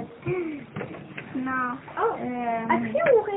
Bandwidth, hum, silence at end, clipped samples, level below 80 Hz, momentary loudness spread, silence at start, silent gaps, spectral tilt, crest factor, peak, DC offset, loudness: 3.9 kHz; none; 0 s; under 0.1%; -62 dBFS; 15 LU; 0 s; none; -1.5 dB/octave; 18 dB; -10 dBFS; under 0.1%; -27 LUFS